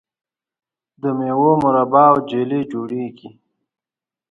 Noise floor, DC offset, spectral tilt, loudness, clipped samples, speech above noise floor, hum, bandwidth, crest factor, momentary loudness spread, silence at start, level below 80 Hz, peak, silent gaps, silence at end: -90 dBFS; under 0.1%; -9 dB/octave; -17 LUFS; under 0.1%; 73 dB; none; 7.2 kHz; 18 dB; 14 LU; 1.05 s; -62 dBFS; 0 dBFS; none; 1.05 s